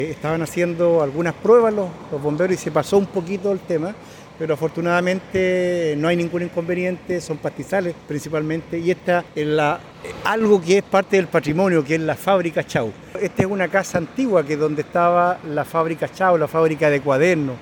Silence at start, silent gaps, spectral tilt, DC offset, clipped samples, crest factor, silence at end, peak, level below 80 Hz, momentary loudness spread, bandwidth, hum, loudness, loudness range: 0 s; none; -6 dB/octave; under 0.1%; under 0.1%; 16 dB; 0 s; -4 dBFS; -54 dBFS; 9 LU; 18 kHz; none; -20 LUFS; 4 LU